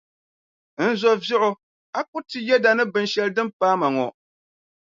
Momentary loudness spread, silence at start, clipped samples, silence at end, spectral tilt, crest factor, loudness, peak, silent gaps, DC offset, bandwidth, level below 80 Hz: 12 LU; 0.8 s; under 0.1%; 0.85 s; -4.5 dB/octave; 20 dB; -22 LUFS; -4 dBFS; 1.63-1.93 s, 2.08-2.13 s, 3.53-3.60 s; under 0.1%; 7.6 kHz; -74 dBFS